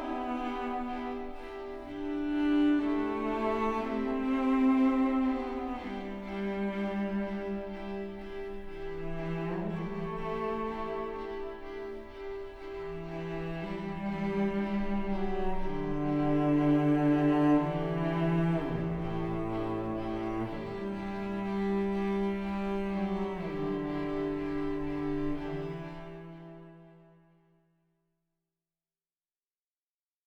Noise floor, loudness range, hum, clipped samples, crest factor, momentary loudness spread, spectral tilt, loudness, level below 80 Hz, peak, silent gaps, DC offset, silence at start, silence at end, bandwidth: under -90 dBFS; 10 LU; none; under 0.1%; 14 dB; 15 LU; -8.5 dB/octave; -32 LUFS; -46 dBFS; -18 dBFS; none; under 0.1%; 0 s; 3.25 s; 6.6 kHz